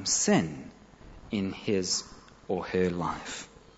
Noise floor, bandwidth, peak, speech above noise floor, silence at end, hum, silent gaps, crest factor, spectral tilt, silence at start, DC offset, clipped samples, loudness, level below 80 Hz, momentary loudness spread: -51 dBFS; 8.2 kHz; -12 dBFS; 21 dB; 0.3 s; none; none; 20 dB; -3.5 dB/octave; 0 s; under 0.1%; under 0.1%; -30 LUFS; -56 dBFS; 20 LU